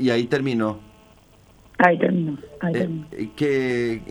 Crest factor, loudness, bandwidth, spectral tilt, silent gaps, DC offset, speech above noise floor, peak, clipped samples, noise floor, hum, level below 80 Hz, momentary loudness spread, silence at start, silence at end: 22 dB; -22 LUFS; over 20 kHz; -7 dB/octave; none; under 0.1%; 30 dB; 0 dBFS; under 0.1%; -52 dBFS; none; -54 dBFS; 13 LU; 0 s; 0 s